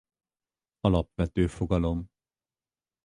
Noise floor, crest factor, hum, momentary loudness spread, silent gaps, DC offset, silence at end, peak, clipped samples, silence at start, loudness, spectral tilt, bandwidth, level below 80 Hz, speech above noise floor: under -90 dBFS; 22 dB; none; 7 LU; none; under 0.1%; 1 s; -8 dBFS; under 0.1%; 0.85 s; -28 LUFS; -8 dB/octave; 10.5 kHz; -40 dBFS; over 64 dB